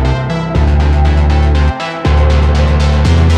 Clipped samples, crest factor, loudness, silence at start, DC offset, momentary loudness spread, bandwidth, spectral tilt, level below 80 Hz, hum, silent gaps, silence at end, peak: under 0.1%; 10 dB; -12 LUFS; 0 s; under 0.1%; 5 LU; 8.2 kHz; -7 dB/octave; -12 dBFS; none; none; 0 s; 0 dBFS